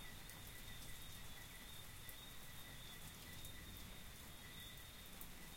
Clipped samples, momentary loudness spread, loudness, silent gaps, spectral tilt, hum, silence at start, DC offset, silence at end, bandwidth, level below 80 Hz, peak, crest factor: under 0.1%; 2 LU; -55 LUFS; none; -2.5 dB/octave; none; 0 s; under 0.1%; 0 s; 16.5 kHz; -62 dBFS; -32 dBFS; 22 dB